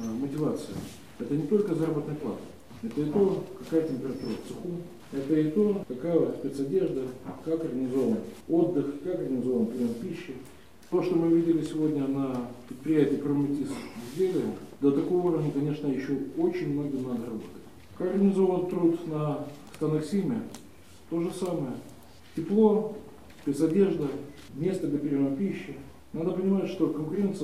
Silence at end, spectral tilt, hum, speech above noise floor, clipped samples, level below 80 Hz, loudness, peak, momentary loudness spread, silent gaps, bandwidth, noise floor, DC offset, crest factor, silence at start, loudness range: 0 s; -8 dB/octave; none; 24 dB; under 0.1%; -62 dBFS; -29 LUFS; -10 dBFS; 14 LU; none; 15 kHz; -52 dBFS; 0.2%; 18 dB; 0 s; 3 LU